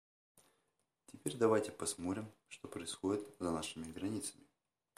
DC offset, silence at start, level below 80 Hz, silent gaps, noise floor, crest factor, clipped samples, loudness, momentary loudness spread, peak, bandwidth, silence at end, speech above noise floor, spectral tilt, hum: under 0.1%; 1.1 s; -72 dBFS; none; -83 dBFS; 22 dB; under 0.1%; -40 LUFS; 13 LU; -18 dBFS; 15.5 kHz; 0.65 s; 44 dB; -4.5 dB/octave; none